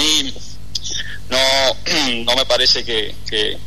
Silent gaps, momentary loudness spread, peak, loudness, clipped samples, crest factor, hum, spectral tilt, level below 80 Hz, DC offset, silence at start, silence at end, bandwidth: none; 13 LU; -2 dBFS; -16 LUFS; under 0.1%; 14 dB; 50 Hz at -40 dBFS; -1.5 dB/octave; -38 dBFS; 6%; 0 s; 0 s; 13.5 kHz